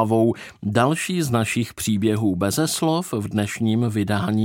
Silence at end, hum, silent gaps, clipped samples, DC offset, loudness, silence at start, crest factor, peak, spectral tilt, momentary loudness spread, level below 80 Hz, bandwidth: 0 s; none; none; under 0.1%; under 0.1%; -22 LUFS; 0 s; 16 dB; -4 dBFS; -5.5 dB/octave; 4 LU; -54 dBFS; 17 kHz